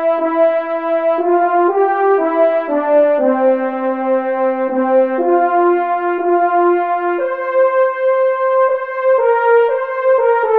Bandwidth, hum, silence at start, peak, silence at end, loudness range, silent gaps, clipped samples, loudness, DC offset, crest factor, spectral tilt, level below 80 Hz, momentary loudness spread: 4.4 kHz; none; 0 s; -2 dBFS; 0 s; 1 LU; none; under 0.1%; -14 LUFS; 0.3%; 12 dB; -7 dB/octave; -68 dBFS; 4 LU